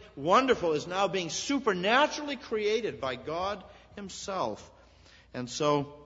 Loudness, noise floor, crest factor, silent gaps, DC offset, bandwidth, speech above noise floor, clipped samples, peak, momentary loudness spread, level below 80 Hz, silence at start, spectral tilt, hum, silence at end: -29 LUFS; -57 dBFS; 22 dB; none; under 0.1%; 8 kHz; 28 dB; under 0.1%; -8 dBFS; 17 LU; -60 dBFS; 0 s; -4 dB/octave; none; 0 s